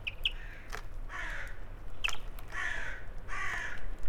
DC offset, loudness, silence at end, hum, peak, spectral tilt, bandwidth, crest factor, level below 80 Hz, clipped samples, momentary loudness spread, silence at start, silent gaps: under 0.1%; -39 LUFS; 0 s; none; -18 dBFS; -2 dB/octave; 16 kHz; 16 dB; -42 dBFS; under 0.1%; 11 LU; 0 s; none